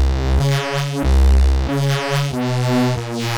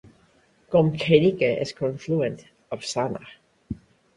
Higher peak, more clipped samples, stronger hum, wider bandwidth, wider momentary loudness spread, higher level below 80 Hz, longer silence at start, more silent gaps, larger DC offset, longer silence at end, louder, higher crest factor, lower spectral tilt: second, -8 dBFS vs -4 dBFS; neither; neither; first, 14.5 kHz vs 11 kHz; second, 5 LU vs 20 LU; first, -18 dBFS vs -56 dBFS; second, 0 s vs 0.7 s; neither; neither; second, 0 s vs 0.4 s; first, -18 LUFS vs -23 LUFS; second, 8 dB vs 22 dB; about the same, -6 dB/octave vs -6 dB/octave